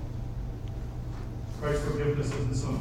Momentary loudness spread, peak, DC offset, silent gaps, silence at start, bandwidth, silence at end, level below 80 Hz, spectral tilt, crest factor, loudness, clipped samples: 9 LU; -16 dBFS; under 0.1%; none; 0 s; 13.5 kHz; 0 s; -38 dBFS; -7 dB/octave; 16 dB; -33 LUFS; under 0.1%